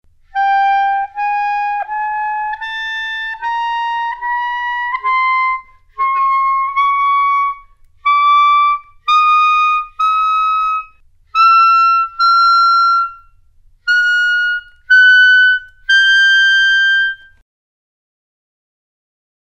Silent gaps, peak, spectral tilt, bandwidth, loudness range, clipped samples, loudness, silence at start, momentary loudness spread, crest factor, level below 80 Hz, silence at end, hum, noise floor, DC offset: none; -2 dBFS; 3 dB/octave; 9.4 kHz; 8 LU; under 0.1%; -12 LUFS; 0.35 s; 12 LU; 12 dB; -50 dBFS; 2.25 s; none; -48 dBFS; under 0.1%